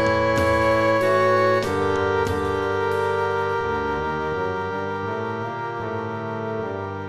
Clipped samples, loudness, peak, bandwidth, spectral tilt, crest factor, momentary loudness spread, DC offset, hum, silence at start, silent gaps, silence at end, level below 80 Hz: under 0.1%; -22 LUFS; -8 dBFS; 14 kHz; -6 dB/octave; 14 dB; 9 LU; 0.3%; none; 0 s; none; 0 s; -44 dBFS